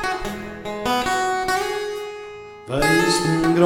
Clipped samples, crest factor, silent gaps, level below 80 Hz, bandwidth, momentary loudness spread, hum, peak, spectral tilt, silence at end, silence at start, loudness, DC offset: under 0.1%; 18 dB; none; -42 dBFS; 17 kHz; 15 LU; none; -2 dBFS; -4.5 dB/octave; 0 s; 0 s; -21 LUFS; under 0.1%